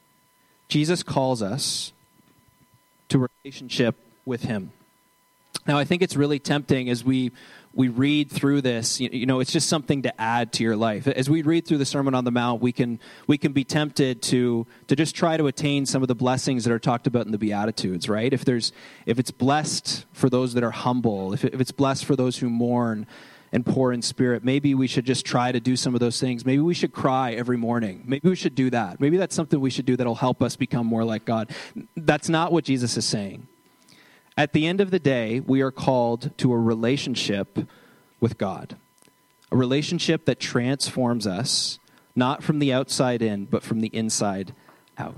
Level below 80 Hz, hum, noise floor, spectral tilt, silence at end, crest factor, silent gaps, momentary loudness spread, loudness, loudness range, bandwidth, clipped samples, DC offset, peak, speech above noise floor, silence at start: -62 dBFS; none; -63 dBFS; -5 dB/octave; 0 s; 18 dB; none; 7 LU; -24 LUFS; 4 LU; 13.5 kHz; under 0.1%; under 0.1%; -6 dBFS; 40 dB; 0.7 s